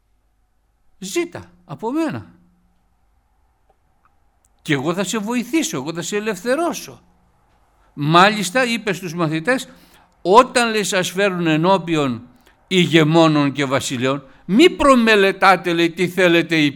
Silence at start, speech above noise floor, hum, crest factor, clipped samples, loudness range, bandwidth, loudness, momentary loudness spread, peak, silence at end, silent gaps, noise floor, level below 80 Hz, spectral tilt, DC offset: 1 s; 45 dB; none; 18 dB; under 0.1%; 13 LU; 18.5 kHz; -17 LUFS; 14 LU; 0 dBFS; 0 s; none; -62 dBFS; -50 dBFS; -4.5 dB/octave; under 0.1%